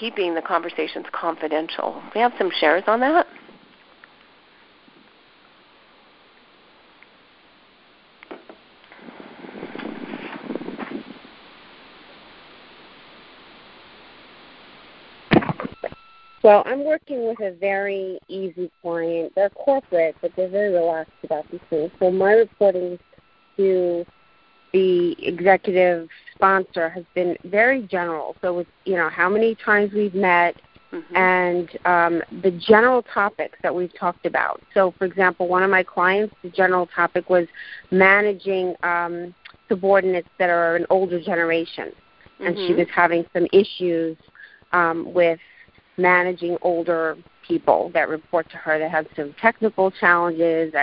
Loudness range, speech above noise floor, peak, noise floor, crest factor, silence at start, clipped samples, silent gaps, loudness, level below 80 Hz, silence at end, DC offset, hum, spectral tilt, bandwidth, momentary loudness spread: 9 LU; 36 dB; 0 dBFS; -56 dBFS; 22 dB; 0 s; under 0.1%; none; -20 LUFS; -60 dBFS; 0 s; under 0.1%; none; -10 dB/octave; 5.4 kHz; 15 LU